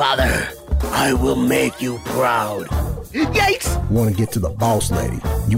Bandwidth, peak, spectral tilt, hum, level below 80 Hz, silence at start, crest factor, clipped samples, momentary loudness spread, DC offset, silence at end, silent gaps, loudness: 16.5 kHz; -4 dBFS; -5 dB/octave; none; -26 dBFS; 0 s; 14 dB; under 0.1%; 7 LU; under 0.1%; 0 s; none; -19 LUFS